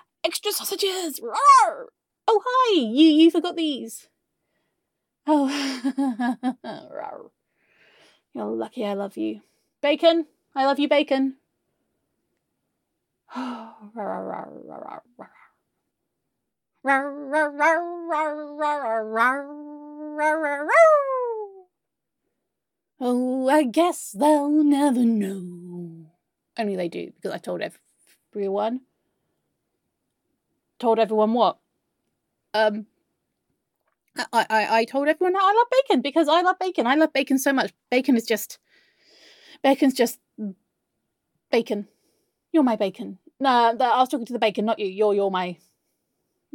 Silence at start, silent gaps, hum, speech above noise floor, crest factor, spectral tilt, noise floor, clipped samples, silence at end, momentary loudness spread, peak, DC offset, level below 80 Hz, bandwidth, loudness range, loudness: 0.25 s; none; none; 62 dB; 20 dB; -4 dB/octave; -84 dBFS; under 0.1%; 1 s; 17 LU; -4 dBFS; under 0.1%; -78 dBFS; 17.5 kHz; 12 LU; -22 LUFS